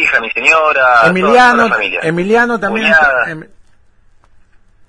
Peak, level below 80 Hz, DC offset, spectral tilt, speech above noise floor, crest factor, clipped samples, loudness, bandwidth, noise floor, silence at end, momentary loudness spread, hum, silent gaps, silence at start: 0 dBFS; -44 dBFS; under 0.1%; -4.5 dB/octave; 35 dB; 12 dB; 0.1%; -10 LUFS; 10.5 kHz; -46 dBFS; 1.45 s; 8 LU; none; none; 0 s